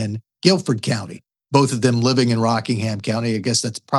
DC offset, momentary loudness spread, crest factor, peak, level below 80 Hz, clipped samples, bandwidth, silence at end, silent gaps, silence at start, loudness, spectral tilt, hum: under 0.1%; 7 LU; 18 dB; 0 dBFS; -68 dBFS; under 0.1%; 12 kHz; 0 s; none; 0 s; -19 LUFS; -5 dB/octave; none